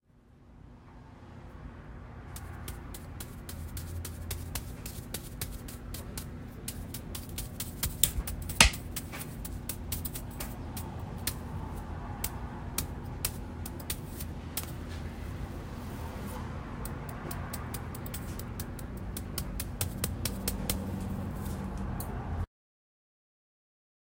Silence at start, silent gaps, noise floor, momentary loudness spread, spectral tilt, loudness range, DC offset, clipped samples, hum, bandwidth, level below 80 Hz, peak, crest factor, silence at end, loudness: 0.15 s; none; -58 dBFS; 10 LU; -3.5 dB/octave; 11 LU; under 0.1%; under 0.1%; none; 16.5 kHz; -44 dBFS; 0 dBFS; 36 dB; 1.6 s; -36 LUFS